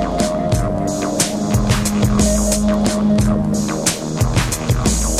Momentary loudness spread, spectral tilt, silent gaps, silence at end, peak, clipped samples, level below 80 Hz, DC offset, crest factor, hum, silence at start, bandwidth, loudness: 3 LU; -5 dB/octave; none; 0 s; -2 dBFS; under 0.1%; -26 dBFS; under 0.1%; 14 dB; none; 0 s; 15.5 kHz; -17 LUFS